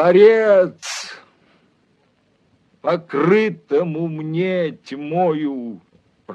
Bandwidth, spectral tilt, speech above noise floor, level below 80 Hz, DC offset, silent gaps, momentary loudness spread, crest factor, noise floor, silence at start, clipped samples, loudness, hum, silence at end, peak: 10 kHz; -6 dB/octave; 44 dB; -72 dBFS; under 0.1%; none; 17 LU; 18 dB; -61 dBFS; 0 s; under 0.1%; -18 LUFS; none; 0 s; -2 dBFS